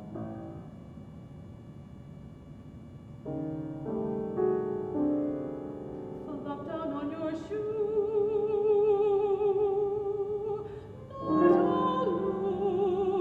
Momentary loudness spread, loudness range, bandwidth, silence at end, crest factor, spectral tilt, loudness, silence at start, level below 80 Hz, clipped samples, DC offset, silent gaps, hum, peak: 22 LU; 12 LU; 4.6 kHz; 0 s; 18 dB; -9 dB/octave; -30 LUFS; 0 s; -58 dBFS; under 0.1%; under 0.1%; none; none; -12 dBFS